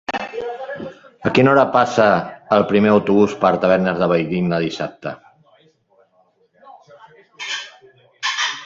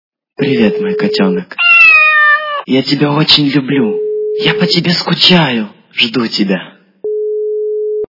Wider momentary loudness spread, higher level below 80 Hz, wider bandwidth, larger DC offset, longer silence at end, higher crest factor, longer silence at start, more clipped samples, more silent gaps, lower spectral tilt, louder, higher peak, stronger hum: first, 17 LU vs 13 LU; about the same, -56 dBFS vs -54 dBFS; first, 7.8 kHz vs 6 kHz; neither; second, 0 s vs 0.15 s; first, 18 dB vs 12 dB; second, 0.1 s vs 0.4 s; second, under 0.1% vs 0.4%; neither; about the same, -5.5 dB/octave vs -5.5 dB/octave; second, -17 LUFS vs -10 LUFS; about the same, -2 dBFS vs 0 dBFS; neither